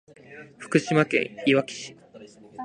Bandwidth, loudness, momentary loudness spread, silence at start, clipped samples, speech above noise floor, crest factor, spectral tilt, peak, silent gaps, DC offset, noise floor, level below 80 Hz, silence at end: 10.5 kHz; -24 LUFS; 23 LU; 0.3 s; under 0.1%; 24 dB; 22 dB; -5.5 dB/octave; -4 dBFS; none; under 0.1%; -48 dBFS; -70 dBFS; 0 s